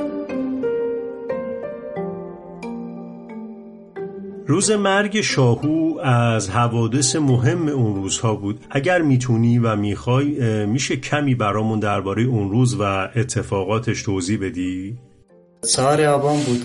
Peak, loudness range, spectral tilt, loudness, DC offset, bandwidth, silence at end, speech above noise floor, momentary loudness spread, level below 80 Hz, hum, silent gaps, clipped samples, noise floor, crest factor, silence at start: -4 dBFS; 9 LU; -5.5 dB/octave; -20 LUFS; under 0.1%; 11.5 kHz; 0 s; 33 dB; 15 LU; -52 dBFS; none; none; under 0.1%; -51 dBFS; 16 dB; 0 s